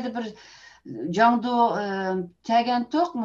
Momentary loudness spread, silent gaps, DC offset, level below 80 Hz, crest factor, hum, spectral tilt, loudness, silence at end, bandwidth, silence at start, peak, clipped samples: 14 LU; none; under 0.1%; -66 dBFS; 18 dB; none; -6 dB/octave; -24 LUFS; 0 s; 7.6 kHz; 0 s; -6 dBFS; under 0.1%